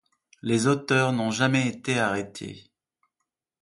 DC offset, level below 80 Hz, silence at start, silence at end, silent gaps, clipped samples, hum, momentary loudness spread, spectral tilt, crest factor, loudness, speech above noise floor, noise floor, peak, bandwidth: under 0.1%; -64 dBFS; 0.45 s; 1 s; none; under 0.1%; none; 14 LU; -5 dB/octave; 18 dB; -24 LUFS; 59 dB; -83 dBFS; -8 dBFS; 11.5 kHz